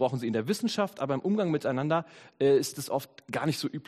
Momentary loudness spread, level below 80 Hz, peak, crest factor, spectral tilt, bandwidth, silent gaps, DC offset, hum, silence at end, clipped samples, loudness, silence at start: 8 LU; -72 dBFS; -12 dBFS; 16 dB; -5.5 dB/octave; 15.5 kHz; none; under 0.1%; none; 0.05 s; under 0.1%; -29 LUFS; 0 s